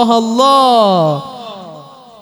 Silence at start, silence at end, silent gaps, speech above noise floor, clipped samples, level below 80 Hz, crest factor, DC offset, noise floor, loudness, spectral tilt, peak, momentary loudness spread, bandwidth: 0 s; 0.4 s; none; 25 dB; under 0.1%; -62 dBFS; 12 dB; under 0.1%; -35 dBFS; -11 LUFS; -5.5 dB/octave; 0 dBFS; 20 LU; over 20 kHz